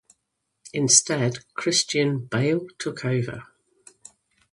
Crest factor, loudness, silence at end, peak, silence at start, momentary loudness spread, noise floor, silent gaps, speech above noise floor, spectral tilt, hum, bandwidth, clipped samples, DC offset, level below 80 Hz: 24 dB; -22 LUFS; 1.1 s; -2 dBFS; 0.65 s; 15 LU; -78 dBFS; none; 54 dB; -3 dB/octave; none; 11.5 kHz; under 0.1%; under 0.1%; -64 dBFS